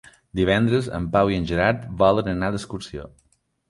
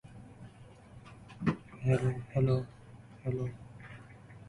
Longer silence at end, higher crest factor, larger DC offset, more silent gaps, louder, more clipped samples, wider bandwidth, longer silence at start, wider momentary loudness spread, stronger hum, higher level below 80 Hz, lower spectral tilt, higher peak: first, 0.6 s vs 0 s; about the same, 20 dB vs 18 dB; neither; neither; first, -21 LUFS vs -34 LUFS; neither; about the same, 11.5 kHz vs 11 kHz; first, 0.35 s vs 0.05 s; second, 14 LU vs 24 LU; neither; first, -42 dBFS vs -58 dBFS; second, -6.5 dB/octave vs -8.5 dB/octave; first, -4 dBFS vs -16 dBFS